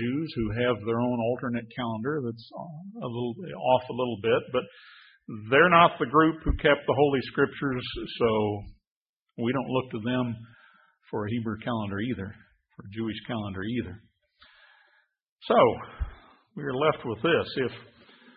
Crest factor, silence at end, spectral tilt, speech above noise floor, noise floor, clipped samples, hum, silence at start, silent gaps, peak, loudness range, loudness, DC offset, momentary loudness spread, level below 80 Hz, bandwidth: 24 dB; 0.5 s; -10.5 dB/octave; 40 dB; -67 dBFS; under 0.1%; none; 0 s; 8.87-9.26 s, 15.29-15.37 s; -4 dBFS; 10 LU; -27 LUFS; under 0.1%; 18 LU; -46 dBFS; 5.4 kHz